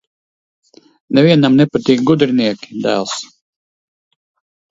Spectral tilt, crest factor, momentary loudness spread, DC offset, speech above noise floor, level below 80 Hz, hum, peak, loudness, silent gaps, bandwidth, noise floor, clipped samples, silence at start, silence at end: -6 dB/octave; 16 dB; 12 LU; under 0.1%; over 77 dB; -56 dBFS; none; 0 dBFS; -14 LUFS; none; 8 kHz; under -90 dBFS; under 0.1%; 1.1 s; 1.45 s